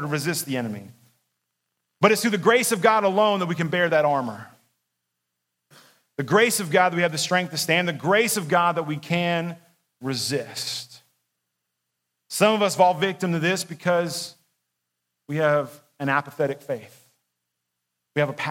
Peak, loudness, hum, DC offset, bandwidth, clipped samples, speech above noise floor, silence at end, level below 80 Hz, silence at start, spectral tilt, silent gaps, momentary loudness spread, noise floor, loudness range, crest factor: -2 dBFS; -22 LUFS; none; under 0.1%; 16.5 kHz; under 0.1%; 58 dB; 0 s; -74 dBFS; 0 s; -4 dB/octave; none; 14 LU; -80 dBFS; 7 LU; 22 dB